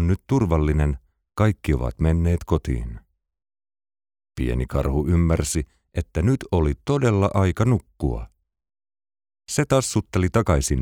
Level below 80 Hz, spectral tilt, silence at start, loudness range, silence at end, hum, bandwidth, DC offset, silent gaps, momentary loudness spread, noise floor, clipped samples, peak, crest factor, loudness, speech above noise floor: -30 dBFS; -6.5 dB/octave; 0 s; 4 LU; 0 s; none; 16 kHz; under 0.1%; none; 9 LU; under -90 dBFS; under 0.1%; -6 dBFS; 16 dB; -22 LUFS; over 69 dB